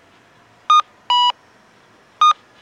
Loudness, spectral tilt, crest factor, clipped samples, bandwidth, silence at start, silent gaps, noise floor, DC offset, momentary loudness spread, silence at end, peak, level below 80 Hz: -16 LUFS; 1.5 dB/octave; 14 dB; under 0.1%; 9 kHz; 0.7 s; none; -51 dBFS; under 0.1%; 14 LU; 0.3 s; -6 dBFS; -74 dBFS